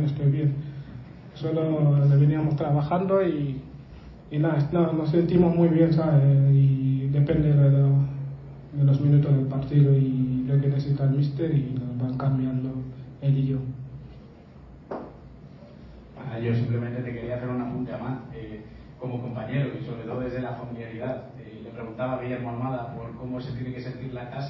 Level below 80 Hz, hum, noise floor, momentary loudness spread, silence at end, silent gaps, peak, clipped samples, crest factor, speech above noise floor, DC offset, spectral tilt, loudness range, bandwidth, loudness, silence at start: -50 dBFS; none; -47 dBFS; 19 LU; 0 s; none; -8 dBFS; under 0.1%; 16 dB; 24 dB; under 0.1%; -11 dB/octave; 12 LU; 5.6 kHz; -24 LUFS; 0 s